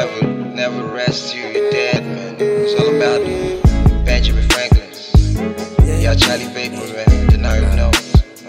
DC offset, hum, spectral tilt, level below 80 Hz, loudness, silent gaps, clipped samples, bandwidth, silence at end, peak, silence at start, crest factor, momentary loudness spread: under 0.1%; none; -5.5 dB/octave; -18 dBFS; -16 LUFS; none; under 0.1%; 16 kHz; 0 s; 0 dBFS; 0 s; 14 dB; 7 LU